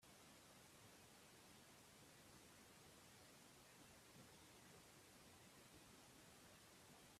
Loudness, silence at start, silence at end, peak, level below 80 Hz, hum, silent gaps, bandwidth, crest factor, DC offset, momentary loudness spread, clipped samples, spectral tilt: -66 LUFS; 0 s; 0 s; -52 dBFS; -84 dBFS; none; none; 15.5 kHz; 16 dB; under 0.1%; 1 LU; under 0.1%; -3 dB/octave